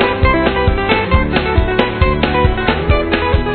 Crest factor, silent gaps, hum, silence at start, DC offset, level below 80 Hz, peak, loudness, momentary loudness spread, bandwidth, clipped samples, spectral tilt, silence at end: 14 dB; none; none; 0 s; under 0.1%; -20 dBFS; 0 dBFS; -14 LUFS; 2 LU; 4.5 kHz; under 0.1%; -9.5 dB/octave; 0 s